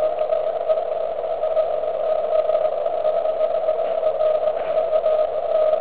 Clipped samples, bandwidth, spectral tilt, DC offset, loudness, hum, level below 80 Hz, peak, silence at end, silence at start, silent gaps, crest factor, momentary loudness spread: under 0.1%; 4 kHz; -7 dB/octave; 1%; -21 LUFS; none; -56 dBFS; -8 dBFS; 0 s; 0 s; none; 12 dB; 3 LU